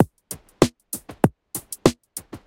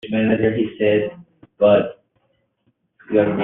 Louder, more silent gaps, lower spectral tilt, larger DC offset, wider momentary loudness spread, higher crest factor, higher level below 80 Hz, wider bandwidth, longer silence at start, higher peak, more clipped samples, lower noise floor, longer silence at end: second, -24 LUFS vs -19 LUFS; neither; about the same, -5.5 dB/octave vs -5.5 dB/octave; neither; first, 15 LU vs 7 LU; first, 24 dB vs 16 dB; first, -48 dBFS vs -56 dBFS; first, 17 kHz vs 4 kHz; about the same, 0 s vs 0.05 s; about the same, 0 dBFS vs -2 dBFS; neither; second, -41 dBFS vs -67 dBFS; about the same, 0.1 s vs 0 s